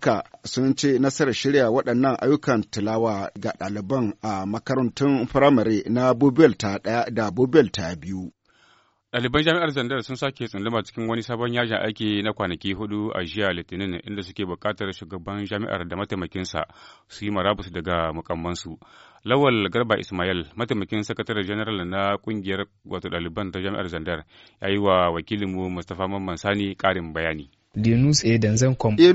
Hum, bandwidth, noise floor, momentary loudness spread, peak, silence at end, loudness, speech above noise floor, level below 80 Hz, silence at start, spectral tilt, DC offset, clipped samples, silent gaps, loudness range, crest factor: none; 8 kHz; -60 dBFS; 12 LU; -2 dBFS; 0 s; -24 LUFS; 37 dB; -50 dBFS; 0 s; -5 dB/octave; under 0.1%; under 0.1%; none; 8 LU; 22 dB